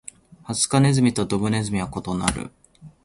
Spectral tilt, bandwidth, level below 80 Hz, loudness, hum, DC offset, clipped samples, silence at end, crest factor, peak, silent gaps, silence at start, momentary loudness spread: -5 dB/octave; 11.5 kHz; -44 dBFS; -22 LUFS; none; under 0.1%; under 0.1%; 0.15 s; 22 dB; -2 dBFS; none; 0.45 s; 15 LU